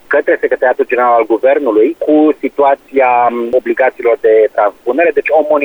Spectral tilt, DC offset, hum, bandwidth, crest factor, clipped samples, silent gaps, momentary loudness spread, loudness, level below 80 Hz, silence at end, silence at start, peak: -6.5 dB/octave; under 0.1%; none; over 20 kHz; 10 dB; under 0.1%; none; 3 LU; -11 LUFS; -54 dBFS; 0 s; 0.1 s; 0 dBFS